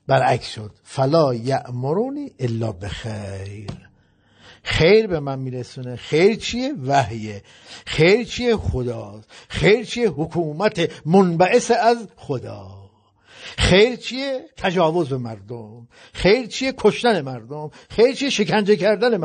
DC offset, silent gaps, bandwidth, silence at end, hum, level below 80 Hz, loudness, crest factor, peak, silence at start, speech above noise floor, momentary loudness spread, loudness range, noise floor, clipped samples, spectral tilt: under 0.1%; none; 9.4 kHz; 0 s; none; -42 dBFS; -19 LUFS; 18 dB; -4 dBFS; 0.1 s; 37 dB; 17 LU; 4 LU; -57 dBFS; under 0.1%; -5.5 dB/octave